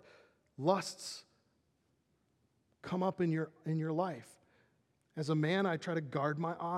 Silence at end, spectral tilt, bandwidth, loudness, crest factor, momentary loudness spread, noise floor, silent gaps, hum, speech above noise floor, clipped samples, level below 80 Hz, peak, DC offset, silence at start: 0 s; -6 dB/octave; 13 kHz; -36 LUFS; 22 dB; 13 LU; -77 dBFS; none; none; 42 dB; under 0.1%; -84 dBFS; -16 dBFS; under 0.1%; 0.6 s